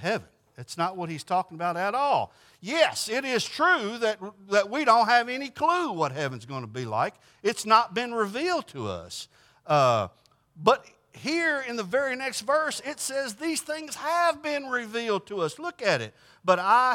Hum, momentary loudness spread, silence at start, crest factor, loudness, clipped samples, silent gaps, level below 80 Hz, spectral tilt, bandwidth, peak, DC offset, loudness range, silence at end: none; 13 LU; 0 s; 22 dB; -26 LUFS; under 0.1%; none; -72 dBFS; -3.5 dB/octave; 17.5 kHz; -4 dBFS; under 0.1%; 4 LU; 0 s